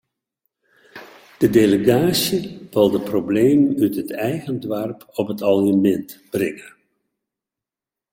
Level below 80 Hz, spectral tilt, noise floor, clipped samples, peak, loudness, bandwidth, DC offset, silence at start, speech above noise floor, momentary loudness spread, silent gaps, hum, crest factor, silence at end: -56 dBFS; -6 dB/octave; -89 dBFS; under 0.1%; -2 dBFS; -19 LUFS; 17 kHz; under 0.1%; 0.95 s; 71 dB; 11 LU; none; none; 18 dB; 1.45 s